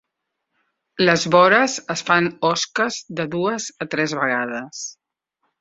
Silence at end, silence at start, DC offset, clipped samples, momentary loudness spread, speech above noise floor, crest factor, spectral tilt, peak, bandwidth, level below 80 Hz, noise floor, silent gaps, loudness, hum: 0.7 s; 1 s; under 0.1%; under 0.1%; 14 LU; 59 dB; 20 dB; -3.5 dB/octave; -2 dBFS; 8 kHz; -62 dBFS; -79 dBFS; none; -19 LUFS; none